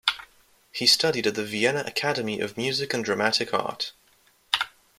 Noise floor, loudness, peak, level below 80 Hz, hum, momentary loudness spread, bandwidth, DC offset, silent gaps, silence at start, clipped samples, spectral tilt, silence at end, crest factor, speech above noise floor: -62 dBFS; -25 LUFS; -4 dBFS; -68 dBFS; none; 11 LU; 16.5 kHz; under 0.1%; none; 0.05 s; under 0.1%; -2.5 dB/octave; 0.3 s; 24 dB; 36 dB